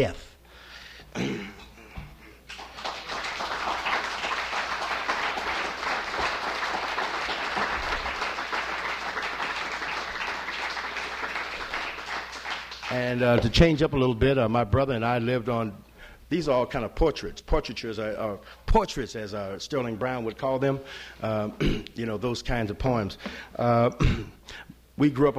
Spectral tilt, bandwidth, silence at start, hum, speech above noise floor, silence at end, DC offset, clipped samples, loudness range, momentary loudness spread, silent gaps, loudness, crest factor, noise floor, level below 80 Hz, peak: -5.5 dB/octave; 16 kHz; 0 s; none; 23 dB; 0 s; under 0.1%; under 0.1%; 7 LU; 14 LU; none; -28 LUFS; 22 dB; -49 dBFS; -40 dBFS; -6 dBFS